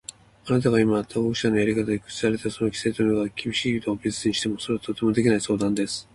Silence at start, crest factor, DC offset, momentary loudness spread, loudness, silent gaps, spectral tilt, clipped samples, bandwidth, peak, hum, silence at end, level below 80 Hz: 0.45 s; 16 dB; under 0.1%; 6 LU; -24 LUFS; none; -5 dB/octave; under 0.1%; 11.5 kHz; -8 dBFS; none; 0.1 s; -54 dBFS